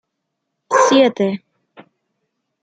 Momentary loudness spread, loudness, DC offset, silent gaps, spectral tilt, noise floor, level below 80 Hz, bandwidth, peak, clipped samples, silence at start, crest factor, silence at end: 10 LU; -15 LUFS; under 0.1%; none; -4 dB/octave; -76 dBFS; -70 dBFS; 9.4 kHz; -2 dBFS; under 0.1%; 0.7 s; 18 dB; 1.25 s